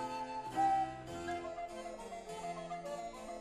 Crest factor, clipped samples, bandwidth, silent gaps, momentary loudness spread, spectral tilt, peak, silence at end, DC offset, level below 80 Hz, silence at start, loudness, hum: 16 dB; under 0.1%; 13 kHz; none; 13 LU; -4.5 dB/octave; -24 dBFS; 0 s; under 0.1%; -64 dBFS; 0 s; -40 LUFS; none